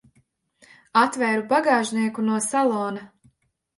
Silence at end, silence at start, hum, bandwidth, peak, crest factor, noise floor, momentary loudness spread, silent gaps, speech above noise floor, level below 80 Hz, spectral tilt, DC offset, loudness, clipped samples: 0.7 s; 0.95 s; none; 11.5 kHz; -4 dBFS; 20 dB; -66 dBFS; 7 LU; none; 44 dB; -72 dBFS; -4 dB/octave; under 0.1%; -22 LUFS; under 0.1%